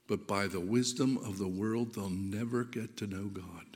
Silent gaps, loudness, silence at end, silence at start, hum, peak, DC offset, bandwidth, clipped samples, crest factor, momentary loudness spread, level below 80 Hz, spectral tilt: none; -35 LUFS; 0 s; 0.1 s; none; -16 dBFS; under 0.1%; 16.5 kHz; under 0.1%; 20 dB; 9 LU; -70 dBFS; -5 dB/octave